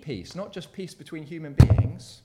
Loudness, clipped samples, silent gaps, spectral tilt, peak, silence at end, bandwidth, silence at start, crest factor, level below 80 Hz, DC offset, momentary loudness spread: -22 LUFS; under 0.1%; none; -7.5 dB/octave; 0 dBFS; 0.1 s; 12.5 kHz; 0.05 s; 24 dB; -34 dBFS; under 0.1%; 20 LU